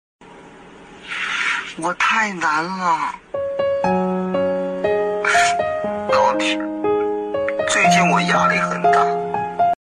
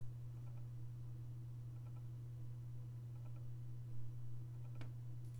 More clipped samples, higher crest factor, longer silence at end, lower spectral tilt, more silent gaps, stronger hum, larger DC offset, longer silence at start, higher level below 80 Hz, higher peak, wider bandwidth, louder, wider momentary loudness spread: neither; about the same, 14 dB vs 14 dB; first, 0.2 s vs 0 s; second, -4 dB/octave vs -8 dB/octave; neither; neither; neither; first, 0.2 s vs 0 s; first, -56 dBFS vs -66 dBFS; first, -6 dBFS vs -34 dBFS; first, 13 kHz vs 7.4 kHz; first, -18 LUFS vs -52 LUFS; first, 7 LU vs 1 LU